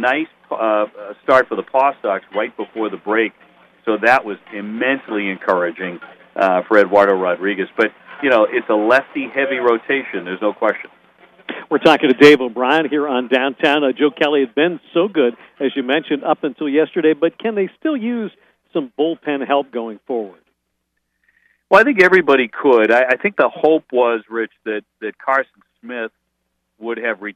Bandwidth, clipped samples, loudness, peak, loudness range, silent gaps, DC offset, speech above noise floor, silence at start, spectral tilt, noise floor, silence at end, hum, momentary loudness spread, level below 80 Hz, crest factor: 11 kHz; under 0.1%; -17 LUFS; 0 dBFS; 6 LU; none; under 0.1%; 55 dB; 0 s; -5.5 dB/octave; -72 dBFS; 0.05 s; none; 15 LU; -62 dBFS; 18 dB